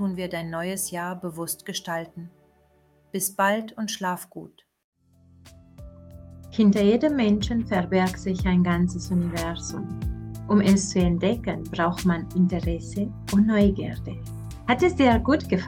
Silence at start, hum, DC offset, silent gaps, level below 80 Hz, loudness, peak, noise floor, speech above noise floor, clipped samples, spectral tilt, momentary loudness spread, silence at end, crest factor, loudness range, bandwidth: 0 s; none; under 0.1%; 4.84-4.92 s; -40 dBFS; -24 LUFS; -6 dBFS; -61 dBFS; 37 dB; under 0.1%; -5.5 dB/octave; 13 LU; 0 s; 18 dB; 7 LU; 16.5 kHz